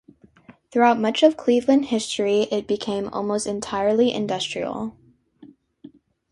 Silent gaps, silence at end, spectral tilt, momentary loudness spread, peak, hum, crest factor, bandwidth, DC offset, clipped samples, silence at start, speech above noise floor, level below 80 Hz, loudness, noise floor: none; 0.85 s; -4.5 dB/octave; 9 LU; -4 dBFS; none; 20 dB; 11.5 kHz; under 0.1%; under 0.1%; 0.7 s; 30 dB; -60 dBFS; -22 LUFS; -51 dBFS